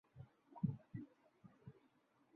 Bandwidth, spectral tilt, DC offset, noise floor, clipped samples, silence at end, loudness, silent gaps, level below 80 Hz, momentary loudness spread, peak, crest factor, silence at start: 4.3 kHz; -11 dB/octave; under 0.1%; -77 dBFS; under 0.1%; 0.6 s; -48 LUFS; none; -78 dBFS; 20 LU; -28 dBFS; 24 dB; 0.15 s